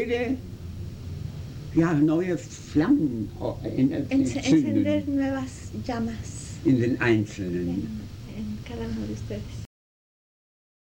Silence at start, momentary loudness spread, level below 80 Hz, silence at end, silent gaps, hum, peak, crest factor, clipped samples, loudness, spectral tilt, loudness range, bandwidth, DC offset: 0 s; 15 LU; -46 dBFS; 1.25 s; none; none; -10 dBFS; 18 dB; under 0.1%; -26 LUFS; -6.5 dB/octave; 7 LU; 16.5 kHz; under 0.1%